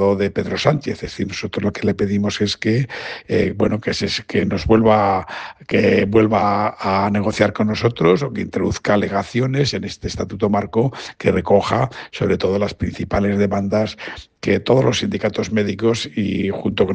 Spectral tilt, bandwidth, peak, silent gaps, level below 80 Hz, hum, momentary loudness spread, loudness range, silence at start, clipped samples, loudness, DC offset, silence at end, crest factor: -6 dB/octave; 9.2 kHz; 0 dBFS; none; -44 dBFS; none; 9 LU; 3 LU; 0 s; under 0.1%; -19 LUFS; under 0.1%; 0 s; 18 dB